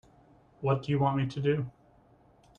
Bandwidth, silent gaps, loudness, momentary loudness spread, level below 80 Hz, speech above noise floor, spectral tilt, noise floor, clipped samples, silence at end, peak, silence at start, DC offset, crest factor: 7 kHz; none; -30 LUFS; 7 LU; -62 dBFS; 33 dB; -8.5 dB/octave; -61 dBFS; under 0.1%; 0.9 s; -14 dBFS; 0.6 s; under 0.1%; 18 dB